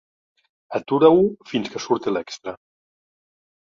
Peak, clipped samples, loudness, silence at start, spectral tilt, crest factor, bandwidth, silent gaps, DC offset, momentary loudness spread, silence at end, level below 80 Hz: -2 dBFS; under 0.1%; -20 LUFS; 0.7 s; -6 dB/octave; 20 dB; 7.4 kHz; none; under 0.1%; 18 LU; 1.15 s; -62 dBFS